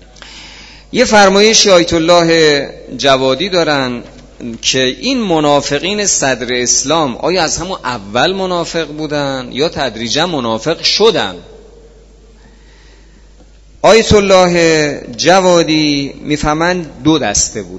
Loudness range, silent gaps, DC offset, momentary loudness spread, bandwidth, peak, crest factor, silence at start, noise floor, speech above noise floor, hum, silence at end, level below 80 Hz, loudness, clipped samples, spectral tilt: 6 LU; none; under 0.1%; 11 LU; 11 kHz; 0 dBFS; 12 dB; 0.2 s; -40 dBFS; 29 dB; none; 0 s; -36 dBFS; -11 LUFS; 0.3%; -3 dB/octave